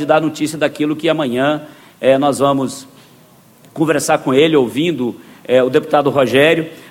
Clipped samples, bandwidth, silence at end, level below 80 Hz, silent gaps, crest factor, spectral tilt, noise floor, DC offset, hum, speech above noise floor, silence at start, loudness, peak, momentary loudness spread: under 0.1%; 16.5 kHz; 0 s; -58 dBFS; none; 16 dB; -5 dB/octave; -46 dBFS; under 0.1%; none; 32 dB; 0 s; -15 LUFS; 0 dBFS; 10 LU